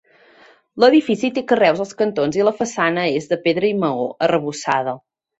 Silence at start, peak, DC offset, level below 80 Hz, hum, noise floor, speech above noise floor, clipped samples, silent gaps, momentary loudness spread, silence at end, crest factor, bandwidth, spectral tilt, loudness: 0.75 s; -2 dBFS; under 0.1%; -62 dBFS; none; -50 dBFS; 33 dB; under 0.1%; none; 7 LU; 0.4 s; 18 dB; 8.2 kHz; -5 dB/octave; -18 LUFS